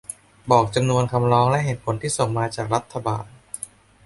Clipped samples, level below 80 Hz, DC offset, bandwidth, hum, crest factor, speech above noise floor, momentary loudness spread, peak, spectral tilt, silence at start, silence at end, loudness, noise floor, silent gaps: under 0.1%; -50 dBFS; under 0.1%; 12 kHz; none; 20 dB; 20 dB; 17 LU; -2 dBFS; -5.5 dB/octave; 0.1 s; 0.4 s; -21 LUFS; -41 dBFS; none